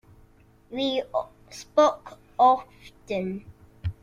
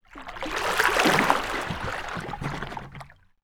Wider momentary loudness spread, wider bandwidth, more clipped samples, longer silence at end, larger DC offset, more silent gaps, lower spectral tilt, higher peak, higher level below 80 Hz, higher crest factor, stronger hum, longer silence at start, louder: about the same, 19 LU vs 19 LU; second, 12 kHz vs over 20 kHz; neither; second, 0.1 s vs 0.3 s; neither; neither; first, -5.5 dB/octave vs -3.5 dB/octave; second, -8 dBFS vs -2 dBFS; second, -54 dBFS vs -46 dBFS; second, 20 dB vs 26 dB; neither; first, 0.7 s vs 0.1 s; about the same, -25 LUFS vs -25 LUFS